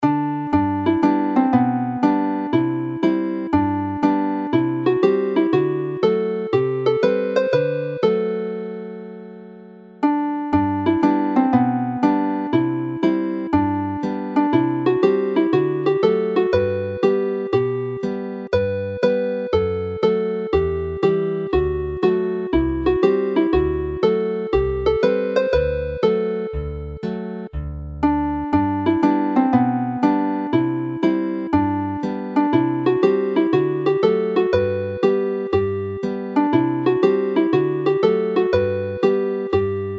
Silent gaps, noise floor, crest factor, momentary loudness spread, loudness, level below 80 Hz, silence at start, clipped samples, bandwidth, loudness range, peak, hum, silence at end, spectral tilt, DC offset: none; -41 dBFS; 16 dB; 6 LU; -20 LUFS; -40 dBFS; 0 s; under 0.1%; 6.8 kHz; 3 LU; -4 dBFS; none; 0 s; -8.5 dB/octave; under 0.1%